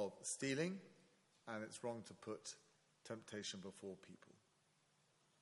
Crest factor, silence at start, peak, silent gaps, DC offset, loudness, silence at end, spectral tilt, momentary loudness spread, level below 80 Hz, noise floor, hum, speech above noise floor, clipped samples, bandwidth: 22 dB; 0 s; -28 dBFS; none; under 0.1%; -48 LUFS; 1.05 s; -3.5 dB/octave; 20 LU; under -90 dBFS; -79 dBFS; none; 30 dB; under 0.1%; 11.5 kHz